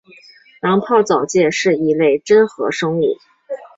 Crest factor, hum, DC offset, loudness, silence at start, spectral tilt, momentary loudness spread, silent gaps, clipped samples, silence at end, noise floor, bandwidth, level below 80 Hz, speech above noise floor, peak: 14 dB; none; under 0.1%; -15 LUFS; 0.65 s; -5 dB/octave; 10 LU; none; under 0.1%; 0.1 s; -46 dBFS; 7.8 kHz; -60 dBFS; 31 dB; -2 dBFS